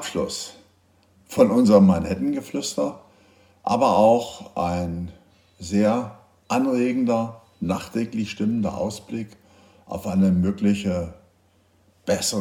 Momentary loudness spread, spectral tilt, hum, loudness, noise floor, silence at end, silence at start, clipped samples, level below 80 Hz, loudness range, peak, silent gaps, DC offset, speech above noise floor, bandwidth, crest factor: 16 LU; -6 dB/octave; none; -22 LUFS; -61 dBFS; 0 s; 0 s; under 0.1%; -56 dBFS; 5 LU; -2 dBFS; none; under 0.1%; 39 dB; 16 kHz; 20 dB